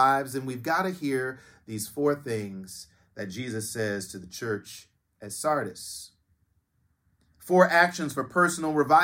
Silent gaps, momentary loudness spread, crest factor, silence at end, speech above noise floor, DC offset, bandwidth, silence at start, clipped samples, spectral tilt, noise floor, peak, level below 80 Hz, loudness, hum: none; 21 LU; 22 dB; 0 s; 44 dB; under 0.1%; 17 kHz; 0 s; under 0.1%; -4.5 dB/octave; -71 dBFS; -6 dBFS; -68 dBFS; -27 LUFS; none